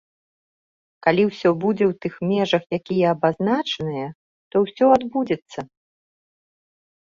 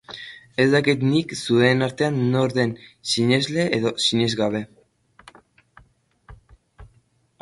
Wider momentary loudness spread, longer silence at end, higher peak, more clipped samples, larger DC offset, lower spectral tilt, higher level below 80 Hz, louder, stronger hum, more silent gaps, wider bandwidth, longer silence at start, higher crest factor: about the same, 11 LU vs 13 LU; first, 1.35 s vs 0.55 s; about the same, -2 dBFS vs -4 dBFS; neither; neither; first, -7 dB/octave vs -5 dB/octave; second, -62 dBFS vs -56 dBFS; about the same, -21 LUFS vs -21 LUFS; neither; first, 4.15-4.51 s vs none; second, 7.4 kHz vs 11.5 kHz; first, 1.05 s vs 0.1 s; about the same, 20 dB vs 20 dB